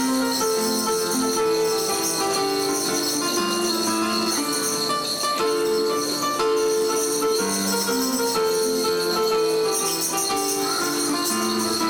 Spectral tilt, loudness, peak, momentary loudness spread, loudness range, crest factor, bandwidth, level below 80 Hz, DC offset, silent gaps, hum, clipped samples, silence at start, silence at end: -2 dB/octave; -21 LUFS; -14 dBFS; 1 LU; 0 LU; 8 dB; 18 kHz; -60 dBFS; under 0.1%; none; none; under 0.1%; 0 s; 0 s